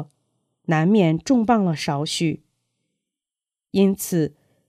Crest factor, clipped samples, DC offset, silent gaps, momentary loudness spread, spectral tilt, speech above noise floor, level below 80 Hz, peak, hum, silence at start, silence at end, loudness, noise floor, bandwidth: 18 dB; under 0.1%; under 0.1%; none; 11 LU; -6 dB/octave; over 71 dB; -58 dBFS; -4 dBFS; none; 0 s; 0.4 s; -21 LUFS; under -90 dBFS; 15.5 kHz